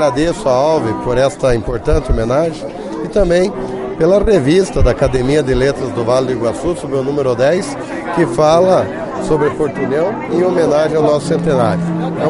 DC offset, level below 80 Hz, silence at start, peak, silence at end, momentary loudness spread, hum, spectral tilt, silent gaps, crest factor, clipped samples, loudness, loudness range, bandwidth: under 0.1%; -26 dBFS; 0 s; 0 dBFS; 0 s; 7 LU; none; -6.5 dB/octave; none; 14 dB; under 0.1%; -14 LUFS; 2 LU; 11 kHz